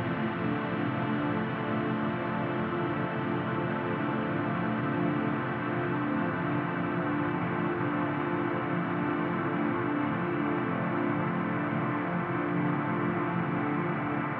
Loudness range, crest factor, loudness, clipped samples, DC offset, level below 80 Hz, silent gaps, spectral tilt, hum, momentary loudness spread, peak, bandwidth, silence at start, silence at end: 1 LU; 12 dB; -30 LUFS; under 0.1%; under 0.1%; -64 dBFS; none; -6 dB/octave; none; 2 LU; -18 dBFS; 4.9 kHz; 0 s; 0 s